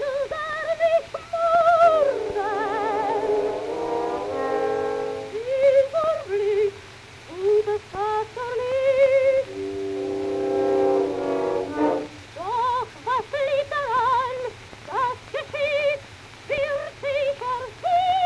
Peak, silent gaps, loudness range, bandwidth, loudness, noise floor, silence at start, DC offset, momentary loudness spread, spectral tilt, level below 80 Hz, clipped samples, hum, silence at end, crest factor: -8 dBFS; none; 4 LU; 11 kHz; -23 LUFS; -43 dBFS; 0 s; under 0.1%; 12 LU; -5 dB/octave; -56 dBFS; under 0.1%; none; 0 s; 16 dB